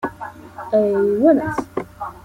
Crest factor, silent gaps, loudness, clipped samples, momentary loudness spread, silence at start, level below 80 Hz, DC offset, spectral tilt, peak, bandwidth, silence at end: 16 dB; none; -18 LUFS; under 0.1%; 19 LU; 0 s; -52 dBFS; under 0.1%; -8 dB/octave; -4 dBFS; 15.5 kHz; 0.05 s